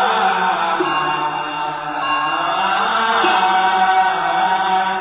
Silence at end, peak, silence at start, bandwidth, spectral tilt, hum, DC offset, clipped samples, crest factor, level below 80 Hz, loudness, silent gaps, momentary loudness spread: 0 s; -4 dBFS; 0 s; 4 kHz; -7 dB/octave; none; under 0.1%; under 0.1%; 12 dB; -56 dBFS; -17 LUFS; none; 7 LU